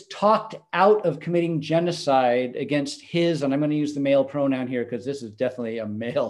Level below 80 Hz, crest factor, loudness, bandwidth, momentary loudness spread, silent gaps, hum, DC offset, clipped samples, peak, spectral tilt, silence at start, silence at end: -70 dBFS; 18 dB; -23 LUFS; 11.5 kHz; 9 LU; none; none; under 0.1%; under 0.1%; -6 dBFS; -6.5 dB/octave; 0 s; 0 s